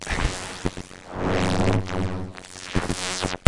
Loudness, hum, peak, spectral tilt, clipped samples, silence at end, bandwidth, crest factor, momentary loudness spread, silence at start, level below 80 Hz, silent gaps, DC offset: -26 LUFS; none; 0 dBFS; -4.5 dB/octave; under 0.1%; 0.1 s; 11.5 kHz; 24 dB; 14 LU; 0 s; -36 dBFS; none; under 0.1%